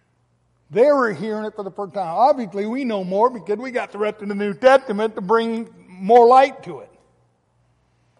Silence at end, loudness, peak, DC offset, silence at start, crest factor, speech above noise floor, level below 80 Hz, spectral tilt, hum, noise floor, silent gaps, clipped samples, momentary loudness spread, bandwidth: 1.35 s; -19 LUFS; -2 dBFS; under 0.1%; 0.7 s; 16 dB; 46 dB; -68 dBFS; -6 dB/octave; none; -64 dBFS; none; under 0.1%; 16 LU; 11 kHz